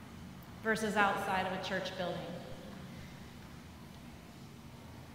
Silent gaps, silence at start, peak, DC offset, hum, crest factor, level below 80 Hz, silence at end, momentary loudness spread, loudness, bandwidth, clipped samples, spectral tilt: none; 0 s; -14 dBFS; under 0.1%; none; 26 dB; -62 dBFS; 0 s; 21 LU; -36 LUFS; 16 kHz; under 0.1%; -4.5 dB/octave